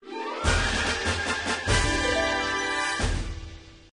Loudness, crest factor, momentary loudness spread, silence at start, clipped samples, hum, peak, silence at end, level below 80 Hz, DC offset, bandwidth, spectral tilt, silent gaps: -25 LUFS; 18 dB; 10 LU; 0.05 s; under 0.1%; none; -10 dBFS; 0.15 s; -34 dBFS; under 0.1%; 10.5 kHz; -3.5 dB/octave; none